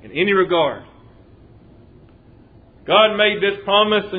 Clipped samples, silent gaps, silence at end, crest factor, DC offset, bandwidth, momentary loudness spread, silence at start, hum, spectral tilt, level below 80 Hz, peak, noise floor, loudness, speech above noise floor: under 0.1%; none; 0 s; 18 dB; under 0.1%; 4.9 kHz; 8 LU; 0.05 s; none; -7.5 dB/octave; -54 dBFS; -2 dBFS; -47 dBFS; -16 LUFS; 31 dB